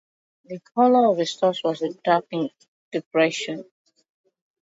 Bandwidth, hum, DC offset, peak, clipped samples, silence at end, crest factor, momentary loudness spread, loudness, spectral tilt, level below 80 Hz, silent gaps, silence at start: 8 kHz; none; under 0.1%; -6 dBFS; under 0.1%; 1.1 s; 18 dB; 14 LU; -22 LUFS; -5 dB/octave; -78 dBFS; 2.68-2.91 s, 3.06-3.11 s; 0.5 s